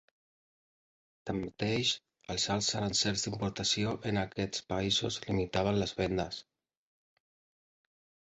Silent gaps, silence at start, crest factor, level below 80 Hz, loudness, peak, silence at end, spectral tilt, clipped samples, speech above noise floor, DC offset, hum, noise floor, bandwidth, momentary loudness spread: none; 1.25 s; 18 dB; -56 dBFS; -32 LUFS; -16 dBFS; 1.85 s; -3.5 dB/octave; under 0.1%; over 57 dB; under 0.1%; none; under -90 dBFS; 8 kHz; 8 LU